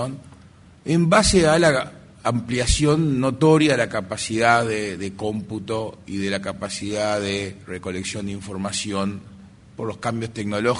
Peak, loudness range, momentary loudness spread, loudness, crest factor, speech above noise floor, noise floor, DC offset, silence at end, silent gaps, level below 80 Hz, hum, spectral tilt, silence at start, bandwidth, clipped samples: -2 dBFS; 9 LU; 15 LU; -22 LUFS; 20 dB; 27 dB; -48 dBFS; under 0.1%; 0 s; none; -38 dBFS; none; -5 dB/octave; 0 s; 11 kHz; under 0.1%